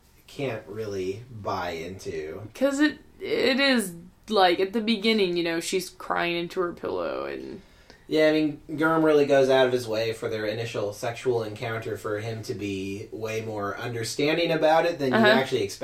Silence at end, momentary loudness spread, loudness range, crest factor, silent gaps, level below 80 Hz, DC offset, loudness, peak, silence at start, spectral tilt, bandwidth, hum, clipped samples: 0 s; 14 LU; 6 LU; 20 dB; none; -58 dBFS; under 0.1%; -25 LUFS; -6 dBFS; 0.3 s; -4.5 dB/octave; 16 kHz; none; under 0.1%